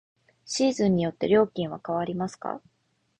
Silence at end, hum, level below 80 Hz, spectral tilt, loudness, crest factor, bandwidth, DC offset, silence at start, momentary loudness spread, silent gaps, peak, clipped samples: 0.6 s; none; -60 dBFS; -5.5 dB/octave; -26 LUFS; 18 dB; 9.6 kHz; under 0.1%; 0.45 s; 12 LU; none; -8 dBFS; under 0.1%